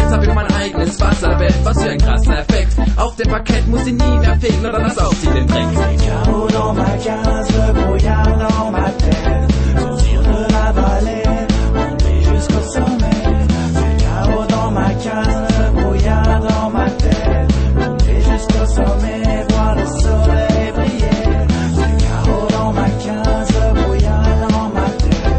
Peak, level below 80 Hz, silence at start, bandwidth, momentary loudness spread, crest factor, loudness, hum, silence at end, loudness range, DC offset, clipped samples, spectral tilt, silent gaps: 0 dBFS; -16 dBFS; 0 s; 8.8 kHz; 3 LU; 12 dB; -15 LUFS; none; 0 s; 1 LU; under 0.1%; under 0.1%; -6.5 dB/octave; none